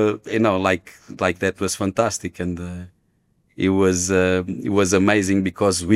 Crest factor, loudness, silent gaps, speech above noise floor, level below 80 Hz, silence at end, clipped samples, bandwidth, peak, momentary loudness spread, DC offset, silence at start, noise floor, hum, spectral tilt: 18 dB; -20 LUFS; none; 44 dB; -56 dBFS; 0 s; under 0.1%; 15.5 kHz; -2 dBFS; 10 LU; under 0.1%; 0 s; -64 dBFS; none; -5 dB/octave